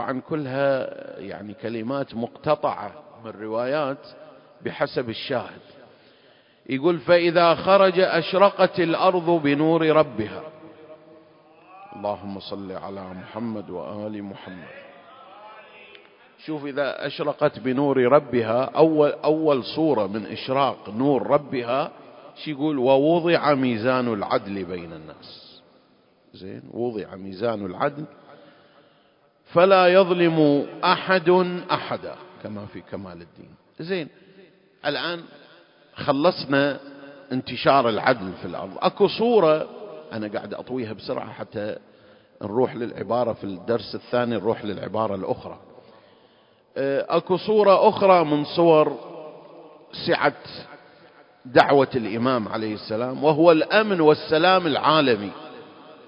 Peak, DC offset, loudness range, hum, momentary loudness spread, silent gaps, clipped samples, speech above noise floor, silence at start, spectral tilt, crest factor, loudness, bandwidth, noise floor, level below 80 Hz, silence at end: 0 dBFS; under 0.1%; 13 LU; none; 20 LU; none; under 0.1%; 38 dB; 0 s; -8.5 dB/octave; 22 dB; -22 LUFS; 5.4 kHz; -60 dBFS; -62 dBFS; 0.15 s